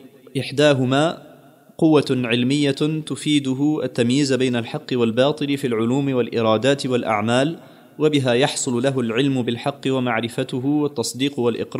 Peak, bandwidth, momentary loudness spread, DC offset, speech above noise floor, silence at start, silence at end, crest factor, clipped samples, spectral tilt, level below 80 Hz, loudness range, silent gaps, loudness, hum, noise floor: -2 dBFS; 15.5 kHz; 7 LU; under 0.1%; 28 dB; 0.05 s; 0 s; 16 dB; under 0.1%; -5.5 dB/octave; -66 dBFS; 1 LU; none; -20 LUFS; none; -48 dBFS